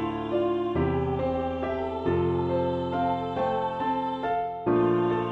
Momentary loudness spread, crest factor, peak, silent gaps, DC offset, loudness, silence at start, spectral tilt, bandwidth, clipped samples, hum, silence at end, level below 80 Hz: 5 LU; 14 dB; -12 dBFS; none; under 0.1%; -27 LUFS; 0 s; -9 dB/octave; 5.2 kHz; under 0.1%; none; 0 s; -48 dBFS